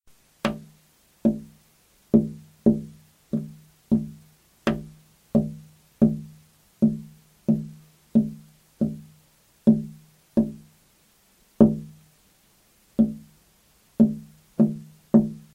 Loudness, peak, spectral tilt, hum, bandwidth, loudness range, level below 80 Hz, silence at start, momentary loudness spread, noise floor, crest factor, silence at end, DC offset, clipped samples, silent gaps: -25 LUFS; -2 dBFS; -8.5 dB/octave; none; 8.4 kHz; 3 LU; -52 dBFS; 0.45 s; 20 LU; -61 dBFS; 24 dB; 0.2 s; under 0.1%; under 0.1%; none